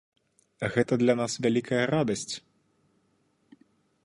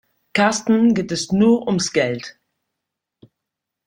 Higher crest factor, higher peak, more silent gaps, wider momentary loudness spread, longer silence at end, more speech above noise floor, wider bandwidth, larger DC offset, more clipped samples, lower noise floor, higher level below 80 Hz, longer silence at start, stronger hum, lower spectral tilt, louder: about the same, 20 dB vs 18 dB; second, -10 dBFS vs -2 dBFS; neither; about the same, 10 LU vs 8 LU; about the same, 1.65 s vs 1.55 s; second, 44 dB vs 65 dB; about the same, 11.5 kHz vs 11 kHz; neither; neither; second, -70 dBFS vs -82 dBFS; second, -64 dBFS vs -56 dBFS; first, 0.6 s vs 0.35 s; neither; about the same, -5 dB/octave vs -4.5 dB/octave; second, -27 LUFS vs -18 LUFS